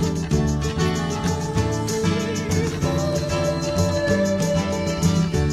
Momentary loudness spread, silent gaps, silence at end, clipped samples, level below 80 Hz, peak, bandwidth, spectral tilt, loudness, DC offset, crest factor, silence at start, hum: 3 LU; none; 0 s; under 0.1%; -34 dBFS; -6 dBFS; 14 kHz; -5.5 dB/octave; -22 LUFS; under 0.1%; 14 dB; 0 s; none